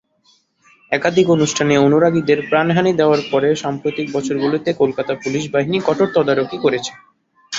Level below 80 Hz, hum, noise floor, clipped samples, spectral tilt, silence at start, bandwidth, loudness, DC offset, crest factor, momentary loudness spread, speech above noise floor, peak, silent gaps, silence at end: -56 dBFS; none; -58 dBFS; under 0.1%; -5.5 dB/octave; 0.9 s; 7.8 kHz; -17 LUFS; under 0.1%; 16 dB; 8 LU; 42 dB; -2 dBFS; none; 0 s